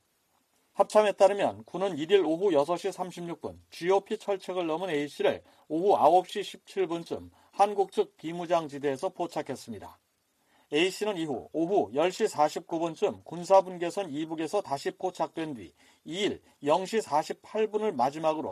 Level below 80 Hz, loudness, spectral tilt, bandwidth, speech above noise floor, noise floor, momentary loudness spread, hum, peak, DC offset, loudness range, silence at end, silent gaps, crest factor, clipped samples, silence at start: -74 dBFS; -29 LUFS; -5 dB/octave; 14 kHz; 44 dB; -72 dBFS; 14 LU; none; -8 dBFS; under 0.1%; 5 LU; 0 s; none; 20 dB; under 0.1%; 0.75 s